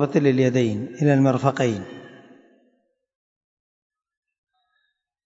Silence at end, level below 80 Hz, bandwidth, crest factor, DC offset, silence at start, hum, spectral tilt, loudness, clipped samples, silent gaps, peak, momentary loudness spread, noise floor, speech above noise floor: 3.2 s; -68 dBFS; 7.8 kHz; 20 dB; under 0.1%; 0 s; none; -7.5 dB/octave; -21 LUFS; under 0.1%; none; -4 dBFS; 14 LU; -73 dBFS; 54 dB